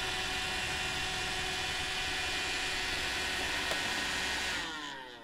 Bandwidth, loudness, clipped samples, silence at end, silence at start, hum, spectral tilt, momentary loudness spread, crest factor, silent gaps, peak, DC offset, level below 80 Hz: 16 kHz; -33 LUFS; under 0.1%; 0 s; 0 s; none; -1.5 dB/octave; 2 LU; 16 dB; none; -18 dBFS; under 0.1%; -50 dBFS